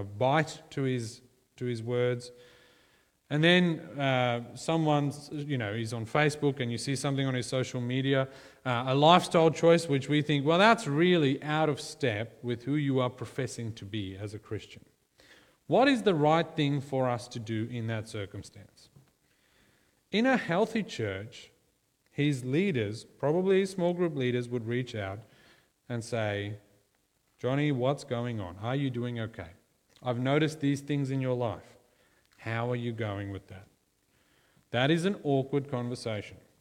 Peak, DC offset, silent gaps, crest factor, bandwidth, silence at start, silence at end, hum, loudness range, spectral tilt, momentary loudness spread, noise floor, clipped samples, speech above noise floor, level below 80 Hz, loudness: -6 dBFS; under 0.1%; none; 24 dB; 14 kHz; 0 s; 0.25 s; none; 9 LU; -6 dB/octave; 15 LU; -73 dBFS; under 0.1%; 44 dB; -68 dBFS; -29 LUFS